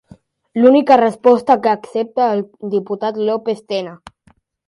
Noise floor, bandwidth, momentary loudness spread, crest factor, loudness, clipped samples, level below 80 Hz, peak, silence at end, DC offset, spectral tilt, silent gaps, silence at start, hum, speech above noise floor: -55 dBFS; 11 kHz; 11 LU; 16 dB; -16 LUFS; under 0.1%; -62 dBFS; 0 dBFS; 0.7 s; under 0.1%; -6.5 dB/octave; none; 0.55 s; none; 41 dB